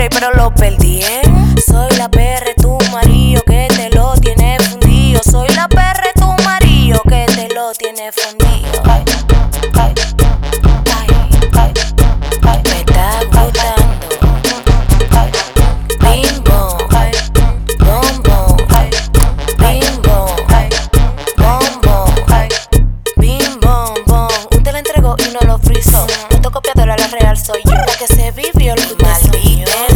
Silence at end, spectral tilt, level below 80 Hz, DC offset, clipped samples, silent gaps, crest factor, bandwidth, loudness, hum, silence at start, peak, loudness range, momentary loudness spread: 0 s; -5 dB/octave; -10 dBFS; 0.6%; 0.7%; none; 8 dB; over 20 kHz; -11 LUFS; none; 0 s; 0 dBFS; 2 LU; 4 LU